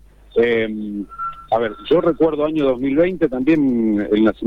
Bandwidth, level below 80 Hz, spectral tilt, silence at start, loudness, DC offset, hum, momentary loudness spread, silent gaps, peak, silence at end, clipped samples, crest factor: 5 kHz; -44 dBFS; -8.5 dB/octave; 0.35 s; -18 LUFS; under 0.1%; none; 10 LU; none; -6 dBFS; 0 s; under 0.1%; 12 dB